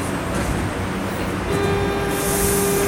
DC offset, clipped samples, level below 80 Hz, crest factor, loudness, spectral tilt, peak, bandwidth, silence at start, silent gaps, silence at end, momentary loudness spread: under 0.1%; under 0.1%; -32 dBFS; 14 dB; -21 LUFS; -4.5 dB/octave; -6 dBFS; 17 kHz; 0 s; none; 0 s; 6 LU